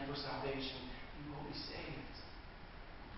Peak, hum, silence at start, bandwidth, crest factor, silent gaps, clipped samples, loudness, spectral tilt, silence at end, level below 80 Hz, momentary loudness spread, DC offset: -30 dBFS; none; 0 s; 5.8 kHz; 16 dB; none; under 0.1%; -46 LUFS; -3.5 dB/octave; 0 s; -56 dBFS; 13 LU; under 0.1%